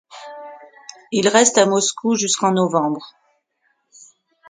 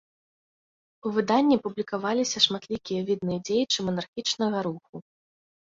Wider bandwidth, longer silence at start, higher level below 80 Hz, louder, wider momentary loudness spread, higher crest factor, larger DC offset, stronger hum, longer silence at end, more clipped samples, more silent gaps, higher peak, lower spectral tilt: first, 9.6 kHz vs 7.8 kHz; second, 0.15 s vs 1.05 s; about the same, -68 dBFS vs -66 dBFS; first, -17 LUFS vs -26 LUFS; first, 24 LU vs 12 LU; about the same, 20 dB vs 22 dB; neither; neither; first, 1.4 s vs 0.75 s; neither; second, none vs 4.08-4.13 s, 4.89-4.93 s; first, 0 dBFS vs -6 dBFS; about the same, -3 dB/octave vs -4 dB/octave